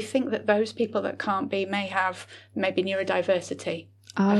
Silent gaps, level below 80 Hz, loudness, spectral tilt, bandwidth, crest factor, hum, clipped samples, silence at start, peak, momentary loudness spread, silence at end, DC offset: none; -78 dBFS; -27 LUFS; -5.5 dB/octave; 12 kHz; 16 dB; none; under 0.1%; 0 s; -10 dBFS; 9 LU; 0 s; under 0.1%